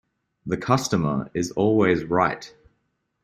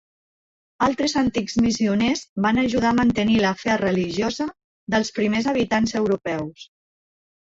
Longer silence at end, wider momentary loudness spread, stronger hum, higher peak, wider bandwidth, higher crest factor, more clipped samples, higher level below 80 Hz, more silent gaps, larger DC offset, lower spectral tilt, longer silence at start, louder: second, 0.75 s vs 0.95 s; first, 10 LU vs 6 LU; neither; about the same, -4 dBFS vs -6 dBFS; first, 15 kHz vs 7.8 kHz; about the same, 20 dB vs 16 dB; neither; second, -54 dBFS vs -48 dBFS; second, none vs 2.29-2.36 s, 4.64-4.87 s; neither; about the same, -6 dB/octave vs -5 dB/octave; second, 0.45 s vs 0.8 s; about the same, -23 LUFS vs -21 LUFS